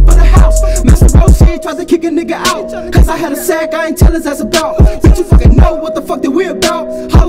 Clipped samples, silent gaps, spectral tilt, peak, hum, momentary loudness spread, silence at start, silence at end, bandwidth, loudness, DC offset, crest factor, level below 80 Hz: 4%; none; -6 dB/octave; 0 dBFS; none; 8 LU; 0 s; 0 s; 16 kHz; -10 LUFS; under 0.1%; 8 dB; -10 dBFS